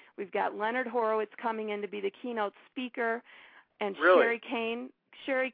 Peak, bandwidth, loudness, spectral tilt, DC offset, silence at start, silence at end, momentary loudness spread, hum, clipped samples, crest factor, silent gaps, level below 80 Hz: -10 dBFS; 4.9 kHz; -31 LUFS; -7.5 dB/octave; under 0.1%; 0.2 s; 0 s; 14 LU; none; under 0.1%; 20 dB; none; -84 dBFS